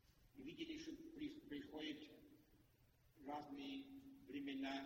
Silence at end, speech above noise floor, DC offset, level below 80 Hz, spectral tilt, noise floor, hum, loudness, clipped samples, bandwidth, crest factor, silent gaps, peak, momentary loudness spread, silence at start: 0 s; 24 dB; under 0.1%; -78 dBFS; -4.5 dB/octave; -75 dBFS; none; -53 LUFS; under 0.1%; 16 kHz; 18 dB; none; -36 dBFS; 12 LU; 0.05 s